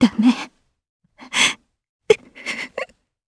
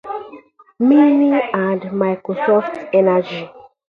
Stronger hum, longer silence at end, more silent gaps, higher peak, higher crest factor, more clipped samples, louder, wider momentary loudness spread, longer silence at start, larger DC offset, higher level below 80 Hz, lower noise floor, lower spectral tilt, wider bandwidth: neither; first, 0.45 s vs 0.25 s; first, 0.89-1.00 s, 1.89-1.99 s vs none; about the same, 0 dBFS vs -2 dBFS; first, 22 dB vs 14 dB; neither; second, -20 LUFS vs -16 LUFS; about the same, 17 LU vs 17 LU; about the same, 0 s vs 0.05 s; neither; about the same, -60 dBFS vs -64 dBFS; second, -38 dBFS vs -42 dBFS; second, -3 dB/octave vs -9 dB/octave; first, 11 kHz vs 5.2 kHz